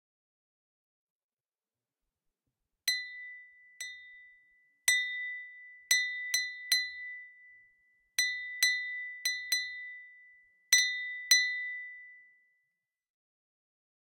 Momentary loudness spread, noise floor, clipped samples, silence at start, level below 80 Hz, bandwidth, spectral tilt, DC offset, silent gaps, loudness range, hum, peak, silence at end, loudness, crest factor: 21 LU; under -90 dBFS; under 0.1%; 2.85 s; -82 dBFS; 16.5 kHz; 5.5 dB/octave; under 0.1%; none; 11 LU; none; -10 dBFS; 1.85 s; -30 LUFS; 26 dB